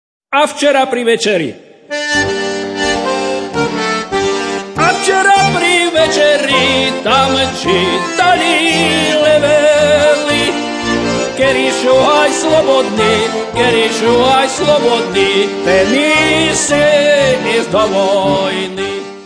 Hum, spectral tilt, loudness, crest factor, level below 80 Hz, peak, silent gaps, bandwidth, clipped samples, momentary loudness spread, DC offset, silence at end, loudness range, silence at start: none; -3 dB/octave; -11 LUFS; 12 dB; -42 dBFS; 0 dBFS; none; 11 kHz; under 0.1%; 7 LU; under 0.1%; 0 s; 4 LU; 0.3 s